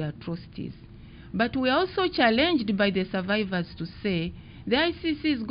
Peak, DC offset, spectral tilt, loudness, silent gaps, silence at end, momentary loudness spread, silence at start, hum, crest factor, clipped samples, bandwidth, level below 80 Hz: -8 dBFS; under 0.1%; -3.5 dB/octave; -26 LUFS; none; 0 s; 14 LU; 0 s; none; 18 dB; under 0.1%; 5.4 kHz; -50 dBFS